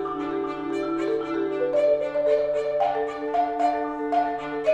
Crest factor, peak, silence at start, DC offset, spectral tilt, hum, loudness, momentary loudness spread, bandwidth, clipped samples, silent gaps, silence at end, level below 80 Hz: 14 dB; -10 dBFS; 0 s; under 0.1%; -6 dB/octave; none; -25 LUFS; 6 LU; 8.6 kHz; under 0.1%; none; 0 s; -58 dBFS